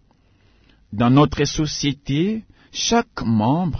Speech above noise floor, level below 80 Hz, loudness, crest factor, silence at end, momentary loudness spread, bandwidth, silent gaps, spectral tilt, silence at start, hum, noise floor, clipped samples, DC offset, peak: 38 dB; -42 dBFS; -20 LUFS; 18 dB; 0 s; 10 LU; 6.6 kHz; none; -5.5 dB/octave; 0.9 s; none; -57 dBFS; under 0.1%; under 0.1%; -2 dBFS